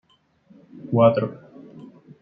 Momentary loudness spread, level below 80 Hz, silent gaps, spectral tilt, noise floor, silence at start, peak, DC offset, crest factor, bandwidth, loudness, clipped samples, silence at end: 26 LU; -66 dBFS; none; -11 dB/octave; -57 dBFS; 0.85 s; -2 dBFS; under 0.1%; 22 dB; 5 kHz; -20 LUFS; under 0.1%; 0.4 s